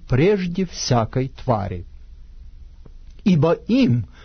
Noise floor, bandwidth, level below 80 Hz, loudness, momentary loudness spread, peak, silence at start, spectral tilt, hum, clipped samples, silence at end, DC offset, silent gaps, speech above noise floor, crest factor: -40 dBFS; 6.6 kHz; -38 dBFS; -20 LUFS; 7 LU; -4 dBFS; 0 s; -6.5 dB/octave; none; under 0.1%; 0.2 s; under 0.1%; none; 21 dB; 16 dB